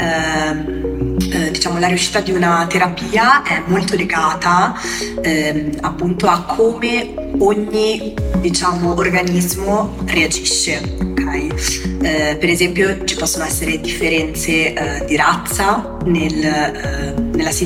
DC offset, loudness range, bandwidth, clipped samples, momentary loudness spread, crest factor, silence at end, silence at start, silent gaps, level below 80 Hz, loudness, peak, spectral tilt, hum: under 0.1%; 2 LU; 17 kHz; under 0.1%; 6 LU; 16 dB; 0 s; 0 s; none; -30 dBFS; -16 LUFS; 0 dBFS; -4 dB/octave; none